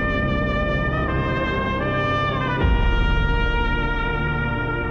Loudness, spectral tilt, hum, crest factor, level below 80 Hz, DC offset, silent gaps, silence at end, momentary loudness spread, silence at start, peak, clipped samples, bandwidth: -22 LUFS; -7.5 dB/octave; none; 14 dB; -24 dBFS; under 0.1%; none; 0 s; 2 LU; 0 s; -8 dBFS; under 0.1%; 6.8 kHz